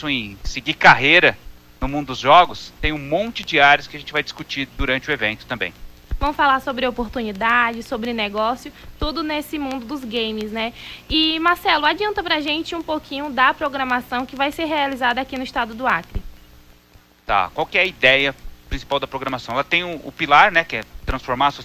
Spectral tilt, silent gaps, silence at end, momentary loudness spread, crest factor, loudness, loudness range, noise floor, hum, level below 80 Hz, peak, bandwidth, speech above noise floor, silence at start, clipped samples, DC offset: -4 dB/octave; none; 0 s; 14 LU; 20 dB; -19 LUFS; 6 LU; -51 dBFS; 60 Hz at -50 dBFS; -38 dBFS; 0 dBFS; 16 kHz; 31 dB; 0 s; under 0.1%; under 0.1%